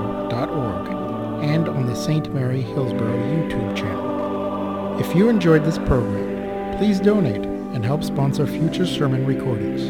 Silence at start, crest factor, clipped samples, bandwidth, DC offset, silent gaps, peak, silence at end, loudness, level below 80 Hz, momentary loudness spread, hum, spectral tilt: 0 s; 18 dB; under 0.1%; 16.5 kHz; 0.3%; none; -4 dBFS; 0 s; -21 LUFS; -40 dBFS; 8 LU; none; -7.5 dB/octave